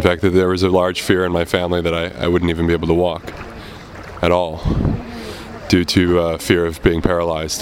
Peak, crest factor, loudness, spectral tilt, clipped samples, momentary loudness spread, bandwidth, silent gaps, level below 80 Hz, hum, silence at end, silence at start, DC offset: 0 dBFS; 18 dB; -17 LUFS; -5.5 dB/octave; under 0.1%; 16 LU; 16.5 kHz; none; -32 dBFS; none; 0 s; 0 s; under 0.1%